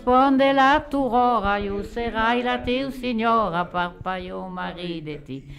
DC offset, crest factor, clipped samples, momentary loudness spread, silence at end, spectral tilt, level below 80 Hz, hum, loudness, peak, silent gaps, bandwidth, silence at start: under 0.1%; 14 dB; under 0.1%; 14 LU; 0 s; -6 dB/octave; -42 dBFS; none; -22 LUFS; -8 dBFS; none; 12.5 kHz; 0 s